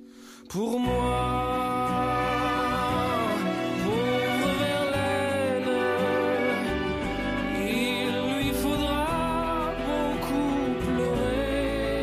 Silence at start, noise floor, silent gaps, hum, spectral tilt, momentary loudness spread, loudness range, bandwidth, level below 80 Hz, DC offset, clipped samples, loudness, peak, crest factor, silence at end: 0 s; -47 dBFS; none; none; -5.5 dB/octave; 3 LU; 1 LU; 15.5 kHz; -40 dBFS; under 0.1%; under 0.1%; -26 LUFS; -14 dBFS; 12 dB; 0 s